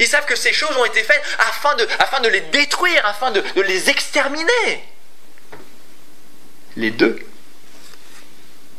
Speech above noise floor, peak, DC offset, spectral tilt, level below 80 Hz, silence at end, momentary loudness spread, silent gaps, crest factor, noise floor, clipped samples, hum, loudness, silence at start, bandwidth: 33 dB; 0 dBFS; 5%; -1.5 dB/octave; -66 dBFS; 0.6 s; 6 LU; none; 20 dB; -50 dBFS; under 0.1%; none; -16 LUFS; 0 s; 16 kHz